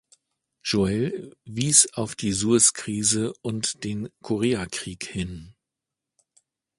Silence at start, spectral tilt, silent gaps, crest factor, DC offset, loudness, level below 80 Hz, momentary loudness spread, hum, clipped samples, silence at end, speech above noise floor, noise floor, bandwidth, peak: 0.65 s; -3.5 dB/octave; none; 24 dB; under 0.1%; -23 LUFS; -52 dBFS; 16 LU; none; under 0.1%; 1.25 s; 62 dB; -87 dBFS; 11.5 kHz; -2 dBFS